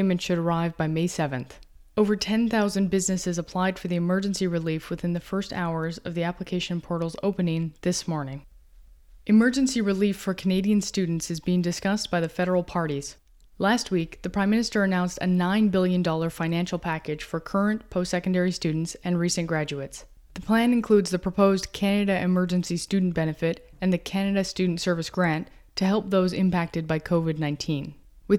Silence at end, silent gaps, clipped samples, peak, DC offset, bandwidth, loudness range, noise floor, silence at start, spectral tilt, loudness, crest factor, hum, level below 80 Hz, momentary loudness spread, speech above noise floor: 0 s; none; under 0.1%; -8 dBFS; under 0.1%; 13.5 kHz; 4 LU; -51 dBFS; 0 s; -5.5 dB/octave; -25 LUFS; 18 dB; none; -50 dBFS; 8 LU; 26 dB